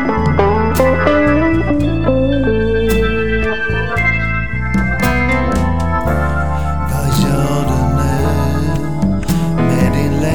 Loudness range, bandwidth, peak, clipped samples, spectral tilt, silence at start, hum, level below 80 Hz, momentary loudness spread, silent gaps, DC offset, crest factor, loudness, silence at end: 2 LU; 19.5 kHz; 0 dBFS; under 0.1%; -6.5 dB/octave; 0 s; none; -22 dBFS; 5 LU; none; 6%; 14 dB; -15 LUFS; 0 s